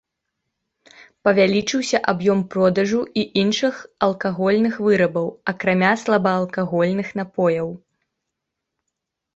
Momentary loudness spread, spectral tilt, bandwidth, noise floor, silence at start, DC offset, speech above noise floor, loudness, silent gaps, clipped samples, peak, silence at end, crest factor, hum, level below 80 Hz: 6 LU; -5.5 dB/octave; 8 kHz; -81 dBFS; 1.25 s; under 0.1%; 61 dB; -20 LUFS; none; under 0.1%; -2 dBFS; 1.6 s; 20 dB; none; -60 dBFS